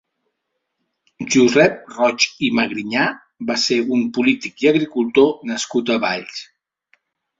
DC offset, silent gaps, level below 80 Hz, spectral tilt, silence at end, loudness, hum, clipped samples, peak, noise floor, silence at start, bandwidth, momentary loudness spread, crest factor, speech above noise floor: under 0.1%; none; -62 dBFS; -4 dB/octave; 0.95 s; -18 LUFS; none; under 0.1%; 0 dBFS; -76 dBFS; 1.2 s; 7.8 kHz; 9 LU; 18 dB; 58 dB